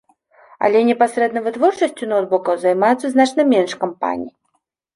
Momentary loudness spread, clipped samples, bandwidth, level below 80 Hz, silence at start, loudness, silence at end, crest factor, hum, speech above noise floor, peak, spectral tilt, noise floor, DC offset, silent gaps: 8 LU; under 0.1%; 11.5 kHz; -66 dBFS; 0.6 s; -17 LUFS; 0.65 s; 16 dB; none; 53 dB; -2 dBFS; -5 dB/octave; -69 dBFS; under 0.1%; none